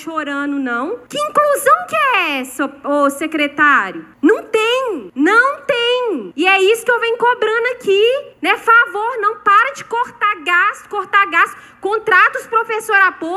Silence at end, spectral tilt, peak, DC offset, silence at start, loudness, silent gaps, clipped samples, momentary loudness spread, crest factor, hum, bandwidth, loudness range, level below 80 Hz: 0 s; -2.5 dB/octave; 0 dBFS; under 0.1%; 0 s; -15 LUFS; none; under 0.1%; 10 LU; 14 dB; none; 15.5 kHz; 1 LU; -64 dBFS